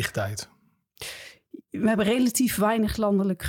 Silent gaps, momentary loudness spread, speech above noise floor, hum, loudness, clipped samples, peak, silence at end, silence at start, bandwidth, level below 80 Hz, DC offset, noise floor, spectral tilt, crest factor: none; 18 LU; 28 dB; none; -24 LUFS; under 0.1%; -10 dBFS; 0 s; 0 s; 18.5 kHz; -48 dBFS; under 0.1%; -52 dBFS; -5 dB/octave; 16 dB